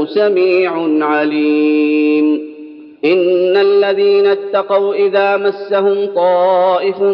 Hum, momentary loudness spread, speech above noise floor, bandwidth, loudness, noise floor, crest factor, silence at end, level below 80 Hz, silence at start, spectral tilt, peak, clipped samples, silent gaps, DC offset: none; 5 LU; 21 dB; 5.4 kHz; -13 LUFS; -33 dBFS; 12 dB; 0 s; -68 dBFS; 0 s; -8 dB/octave; -2 dBFS; under 0.1%; none; under 0.1%